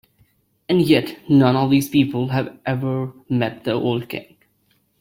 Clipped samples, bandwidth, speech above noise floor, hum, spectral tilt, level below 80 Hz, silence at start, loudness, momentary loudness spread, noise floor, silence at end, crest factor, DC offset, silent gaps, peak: under 0.1%; 16.5 kHz; 45 dB; none; -7 dB/octave; -56 dBFS; 0.7 s; -19 LUFS; 10 LU; -64 dBFS; 0.8 s; 18 dB; under 0.1%; none; -2 dBFS